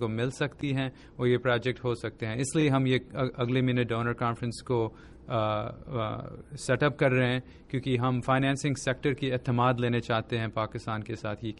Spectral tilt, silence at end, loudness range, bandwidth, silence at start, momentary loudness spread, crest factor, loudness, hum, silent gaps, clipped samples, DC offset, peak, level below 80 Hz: -6 dB/octave; 0 s; 2 LU; 11.5 kHz; 0 s; 9 LU; 16 dB; -29 LUFS; none; none; under 0.1%; under 0.1%; -12 dBFS; -54 dBFS